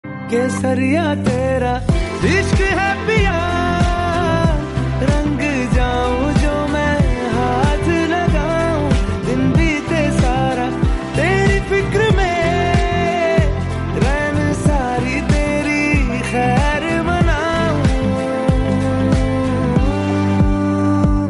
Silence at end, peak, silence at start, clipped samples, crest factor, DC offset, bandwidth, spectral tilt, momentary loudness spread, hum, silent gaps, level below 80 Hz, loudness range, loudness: 0 s; -4 dBFS; 0.05 s; under 0.1%; 12 dB; under 0.1%; 11.5 kHz; -6.5 dB/octave; 3 LU; none; none; -24 dBFS; 1 LU; -17 LUFS